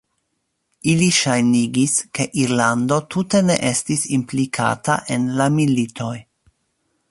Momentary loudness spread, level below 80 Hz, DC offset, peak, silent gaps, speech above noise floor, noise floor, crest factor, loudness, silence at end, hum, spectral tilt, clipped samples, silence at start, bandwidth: 7 LU; -56 dBFS; under 0.1%; 0 dBFS; none; 54 dB; -72 dBFS; 18 dB; -18 LUFS; 0.9 s; none; -4.5 dB/octave; under 0.1%; 0.85 s; 11.5 kHz